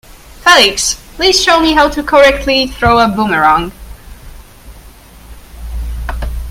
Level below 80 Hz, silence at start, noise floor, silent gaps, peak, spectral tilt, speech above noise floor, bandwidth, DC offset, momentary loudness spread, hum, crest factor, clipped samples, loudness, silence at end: -26 dBFS; 0.1 s; -36 dBFS; none; 0 dBFS; -3 dB/octave; 26 dB; 17 kHz; under 0.1%; 17 LU; none; 12 dB; 0.2%; -10 LUFS; 0 s